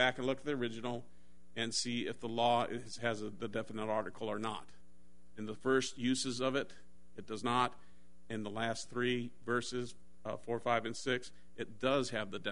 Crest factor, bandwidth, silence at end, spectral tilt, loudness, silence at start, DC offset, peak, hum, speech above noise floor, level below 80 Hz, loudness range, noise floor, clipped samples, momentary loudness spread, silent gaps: 22 dB; 10.5 kHz; 0 s; -4 dB/octave; -37 LUFS; 0 s; 0.5%; -14 dBFS; none; 30 dB; -68 dBFS; 2 LU; -67 dBFS; under 0.1%; 14 LU; none